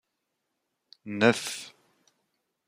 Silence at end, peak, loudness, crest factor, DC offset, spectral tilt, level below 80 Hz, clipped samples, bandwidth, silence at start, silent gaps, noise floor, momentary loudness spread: 1 s; -6 dBFS; -27 LUFS; 26 dB; under 0.1%; -4 dB/octave; -78 dBFS; under 0.1%; 15.5 kHz; 1.05 s; none; -81 dBFS; 23 LU